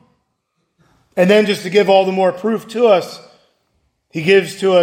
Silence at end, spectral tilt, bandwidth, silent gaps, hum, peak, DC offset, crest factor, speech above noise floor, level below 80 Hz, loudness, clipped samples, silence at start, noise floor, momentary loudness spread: 0 s; -5.5 dB/octave; 16 kHz; none; none; 0 dBFS; under 0.1%; 16 dB; 56 dB; -66 dBFS; -14 LUFS; under 0.1%; 1.15 s; -69 dBFS; 10 LU